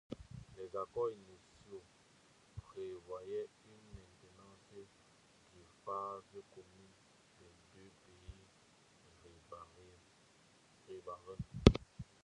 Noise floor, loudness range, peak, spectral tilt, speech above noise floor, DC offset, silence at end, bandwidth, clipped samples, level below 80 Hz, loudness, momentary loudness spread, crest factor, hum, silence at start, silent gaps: -68 dBFS; 22 LU; -6 dBFS; -7 dB/octave; 22 dB; under 0.1%; 0.2 s; 11 kHz; under 0.1%; -52 dBFS; -40 LUFS; 23 LU; 38 dB; none; 0.1 s; none